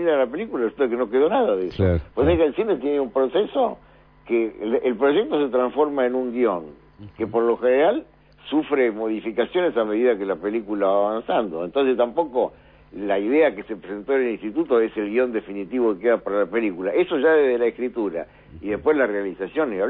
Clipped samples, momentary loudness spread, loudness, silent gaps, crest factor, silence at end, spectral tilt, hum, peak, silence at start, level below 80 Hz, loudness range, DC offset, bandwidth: under 0.1%; 8 LU; -22 LUFS; none; 14 dB; 0 s; -10 dB/octave; none; -8 dBFS; 0 s; -48 dBFS; 2 LU; under 0.1%; 5 kHz